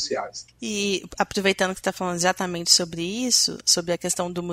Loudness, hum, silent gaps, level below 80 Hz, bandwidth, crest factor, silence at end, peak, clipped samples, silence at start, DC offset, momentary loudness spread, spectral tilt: -22 LUFS; none; none; -56 dBFS; 16 kHz; 22 dB; 0 s; -2 dBFS; under 0.1%; 0 s; under 0.1%; 10 LU; -2 dB/octave